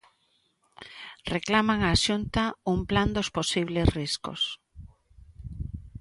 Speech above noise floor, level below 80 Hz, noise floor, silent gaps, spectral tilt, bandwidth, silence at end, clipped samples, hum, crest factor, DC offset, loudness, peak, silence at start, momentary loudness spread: 44 dB; -40 dBFS; -70 dBFS; none; -4.5 dB/octave; 11.5 kHz; 0 s; under 0.1%; none; 22 dB; under 0.1%; -26 LUFS; -6 dBFS; 0.8 s; 19 LU